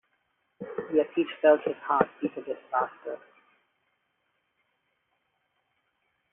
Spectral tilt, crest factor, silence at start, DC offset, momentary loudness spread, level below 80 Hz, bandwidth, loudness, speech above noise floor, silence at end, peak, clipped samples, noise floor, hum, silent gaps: -0.5 dB/octave; 26 dB; 0.6 s; under 0.1%; 18 LU; -78 dBFS; 3.7 kHz; -27 LUFS; 49 dB; 3.15 s; -6 dBFS; under 0.1%; -76 dBFS; none; none